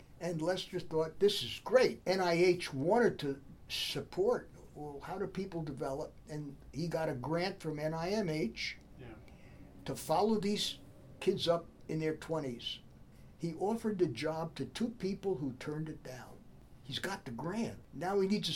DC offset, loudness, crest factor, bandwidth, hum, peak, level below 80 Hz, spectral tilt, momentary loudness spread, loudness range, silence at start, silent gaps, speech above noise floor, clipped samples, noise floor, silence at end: under 0.1%; -36 LUFS; 22 dB; 18 kHz; none; -14 dBFS; -60 dBFS; -5 dB/octave; 16 LU; 7 LU; 0 s; none; 21 dB; under 0.1%; -56 dBFS; 0 s